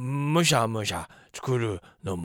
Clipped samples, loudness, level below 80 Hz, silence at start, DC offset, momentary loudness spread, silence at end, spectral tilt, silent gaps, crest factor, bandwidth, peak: under 0.1%; -26 LUFS; -56 dBFS; 0 s; under 0.1%; 15 LU; 0 s; -4.5 dB/octave; none; 20 dB; 18 kHz; -8 dBFS